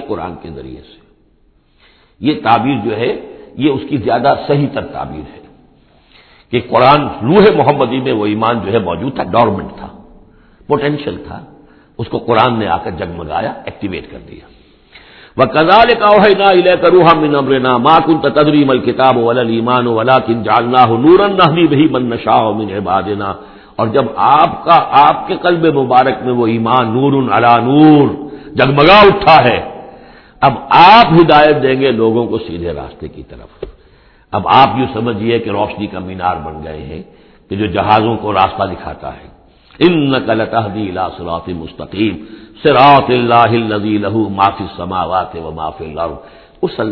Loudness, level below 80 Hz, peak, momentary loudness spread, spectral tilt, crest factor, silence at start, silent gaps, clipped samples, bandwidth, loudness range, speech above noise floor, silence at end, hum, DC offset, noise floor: -11 LUFS; -40 dBFS; 0 dBFS; 18 LU; -8.5 dB/octave; 12 dB; 0 s; none; 0.5%; 5.4 kHz; 9 LU; 41 dB; 0 s; none; under 0.1%; -52 dBFS